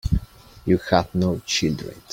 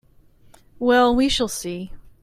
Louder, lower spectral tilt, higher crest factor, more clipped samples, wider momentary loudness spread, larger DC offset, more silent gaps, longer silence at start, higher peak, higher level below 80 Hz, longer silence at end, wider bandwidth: second, -23 LUFS vs -20 LUFS; first, -5 dB/octave vs -3.5 dB/octave; about the same, 20 dB vs 16 dB; neither; second, 9 LU vs 17 LU; neither; neither; second, 0.05 s vs 0.8 s; first, -2 dBFS vs -6 dBFS; first, -34 dBFS vs -40 dBFS; about the same, 0.15 s vs 0.15 s; about the same, 16.5 kHz vs 15.5 kHz